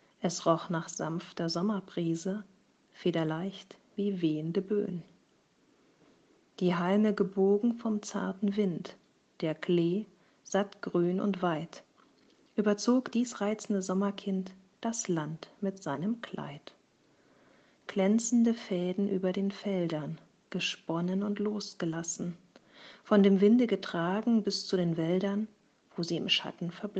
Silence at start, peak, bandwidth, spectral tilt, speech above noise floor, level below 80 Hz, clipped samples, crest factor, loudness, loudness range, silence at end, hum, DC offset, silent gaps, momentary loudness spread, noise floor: 0.2 s; -12 dBFS; 8.6 kHz; -5.5 dB/octave; 38 dB; -76 dBFS; under 0.1%; 20 dB; -31 LUFS; 7 LU; 0 s; none; under 0.1%; none; 13 LU; -68 dBFS